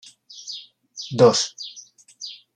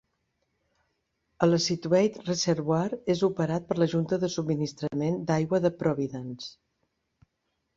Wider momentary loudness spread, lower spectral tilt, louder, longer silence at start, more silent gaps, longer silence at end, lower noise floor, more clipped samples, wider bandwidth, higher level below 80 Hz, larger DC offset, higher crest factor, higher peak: first, 24 LU vs 7 LU; second, -4 dB/octave vs -6 dB/octave; first, -19 LUFS vs -27 LUFS; second, 0.35 s vs 1.4 s; neither; second, 0.2 s vs 1.25 s; second, -47 dBFS vs -79 dBFS; neither; first, 10 kHz vs 7.8 kHz; about the same, -68 dBFS vs -64 dBFS; neither; about the same, 22 dB vs 22 dB; first, -2 dBFS vs -6 dBFS